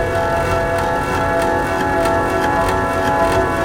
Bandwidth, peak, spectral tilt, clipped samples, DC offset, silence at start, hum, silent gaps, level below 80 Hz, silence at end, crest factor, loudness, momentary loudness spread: 17 kHz; -2 dBFS; -5.5 dB/octave; under 0.1%; 0.4%; 0 s; none; none; -32 dBFS; 0 s; 14 dB; -17 LUFS; 2 LU